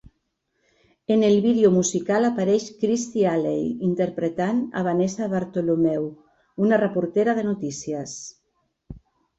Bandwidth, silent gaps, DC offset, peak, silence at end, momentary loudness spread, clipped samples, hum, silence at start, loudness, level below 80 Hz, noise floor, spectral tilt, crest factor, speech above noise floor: 8.2 kHz; none; under 0.1%; -6 dBFS; 0.4 s; 12 LU; under 0.1%; none; 1.1 s; -22 LUFS; -60 dBFS; -74 dBFS; -6 dB/octave; 18 dB; 52 dB